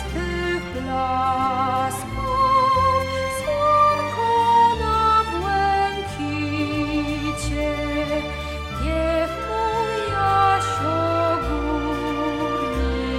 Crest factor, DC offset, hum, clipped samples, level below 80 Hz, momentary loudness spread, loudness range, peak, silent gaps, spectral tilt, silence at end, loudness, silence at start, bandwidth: 14 dB; under 0.1%; none; under 0.1%; -34 dBFS; 8 LU; 5 LU; -6 dBFS; none; -5.5 dB/octave; 0 s; -21 LUFS; 0 s; 16 kHz